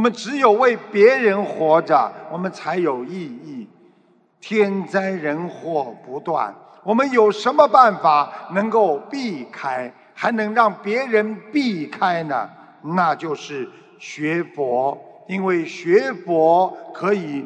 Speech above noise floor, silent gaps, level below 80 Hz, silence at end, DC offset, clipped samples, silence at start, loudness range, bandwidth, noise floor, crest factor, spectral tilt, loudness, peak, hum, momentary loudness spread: 38 dB; none; -78 dBFS; 0 s; under 0.1%; under 0.1%; 0 s; 7 LU; 9.2 kHz; -57 dBFS; 20 dB; -6 dB/octave; -19 LUFS; 0 dBFS; none; 15 LU